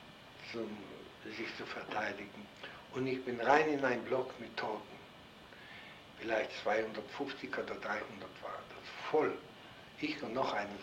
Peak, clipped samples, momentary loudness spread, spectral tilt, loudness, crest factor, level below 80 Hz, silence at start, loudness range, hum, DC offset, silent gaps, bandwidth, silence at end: -14 dBFS; under 0.1%; 18 LU; -5 dB/octave; -38 LUFS; 26 dB; -72 dBFS; 0 s; 5 LU; none; under 0.1%; none; 16 kHz; 0 s